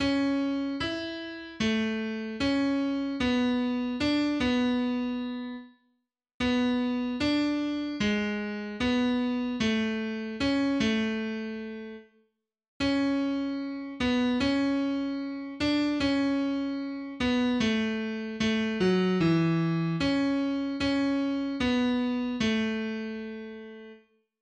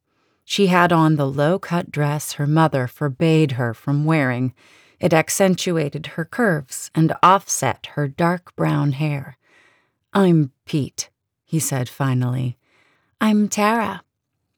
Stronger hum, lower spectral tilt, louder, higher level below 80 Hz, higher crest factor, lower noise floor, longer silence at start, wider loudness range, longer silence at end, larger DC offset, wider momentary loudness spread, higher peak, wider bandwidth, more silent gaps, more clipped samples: neither; about the same, -6 dB/octave vs -5.5 dB/octave; second, -28 LUFS vs -20 LUFS; first, -54 dBFS vs -66 dBFS; about the same, 14 dB vs 16 dB; about the same, -76 dBFS vs -75 dBFS; second, 0 s vs 0.5 s; about the same, 3 LU vs 4 LU; about the same, 0.45 s vs 0.55 s; neither; about the same, 9 LU vs 11 LU; second, -14 dBFS vs -4 dBFS; second, 9 kHz vs over 20 kHz; first, 6.34-6.40 s, 12.68-12.80 s vs none; neither